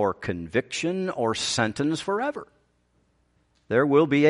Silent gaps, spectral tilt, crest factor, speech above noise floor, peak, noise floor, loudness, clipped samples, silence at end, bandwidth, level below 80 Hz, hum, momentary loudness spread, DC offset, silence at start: none; -5 dB/octave; 18 dB; 43 dB; -8 dBFS; -67 dBFS; -25 LUFS; under 0.1%; 0 s; 11.5 kHz; -60 dBFS; none; 8 LU; under 0.1%; 0 s